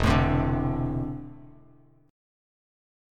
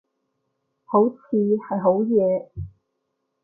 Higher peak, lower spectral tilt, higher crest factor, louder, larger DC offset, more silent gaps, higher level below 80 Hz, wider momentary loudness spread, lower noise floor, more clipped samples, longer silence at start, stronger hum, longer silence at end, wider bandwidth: about the same, -8 dBFS vs -6 dBFS; second, -7.5 dB/octave vs -14.5 dB/octave; about the same, 20 dB vs 18 dB; second, -27 LUFS vs -21 LUFS; neither; neither; first, -36 dBFS vs -52 dBFS; about the same, 16 LU vs 17 LU; second, -57 dBFS vs -76 dBFS; neither; second, 0 s vs 0.9 s; neither; first, 1.6 s vs 0.75 s; first, 12.5 kHz vs 2.4 kHz